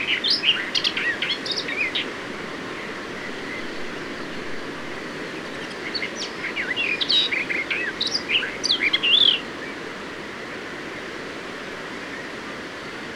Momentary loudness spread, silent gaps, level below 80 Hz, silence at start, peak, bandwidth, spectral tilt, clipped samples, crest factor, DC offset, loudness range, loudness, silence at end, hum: 14 LU; none; -58 dBFS; 0 s; -6 dBFS; 18.5 kHz; -2 dB/octave; under 0.1%; 20 dB; under 0.1%; 12 LU; -24 LUFS; 0 s; none